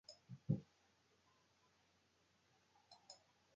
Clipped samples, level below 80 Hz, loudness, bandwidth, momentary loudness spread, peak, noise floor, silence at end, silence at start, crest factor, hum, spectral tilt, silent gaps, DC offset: under 0.1%; -78 dBFS; -47 LUFS; 7.4 kHz; 22 LU; -26 dBFS; -79 dBFS; 0.4 s; 0.1 s; 28 dB; none; -8 dB/octave; none; under 0.1%